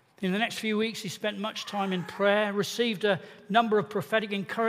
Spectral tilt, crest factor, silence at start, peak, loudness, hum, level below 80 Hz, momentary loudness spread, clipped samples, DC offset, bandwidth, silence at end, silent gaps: -4.5 dB/octave; 20 dB; 0.2 s; -10 dBFS; -28 LUFS; none; -74 dBFS; 8 LU; under 0.1%; under 0.1%; 15.5 kHz; 0 s; none